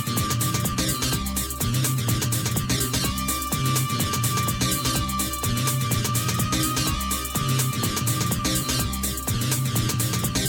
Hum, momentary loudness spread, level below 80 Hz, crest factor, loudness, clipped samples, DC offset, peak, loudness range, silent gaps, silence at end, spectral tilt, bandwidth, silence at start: none; 2 LU; -38 dBFS; 12 dB; -23 LUFS; under 0.1%; under 0.1%; -12 dBFS; 0 LU; none; 0 s; -3.5 dB/octave; 19.5 kHz; 0 s